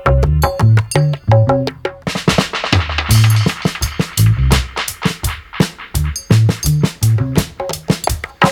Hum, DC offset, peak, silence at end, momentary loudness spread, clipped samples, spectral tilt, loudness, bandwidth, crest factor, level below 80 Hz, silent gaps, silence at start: none; under 0.1%; 0 dBFS; 0 s; 9 LU; under 0.1%; -5.5 dB/octave; -15 LUFS; 18 kHz; 14 dB; -24 dBFS; none; 0 s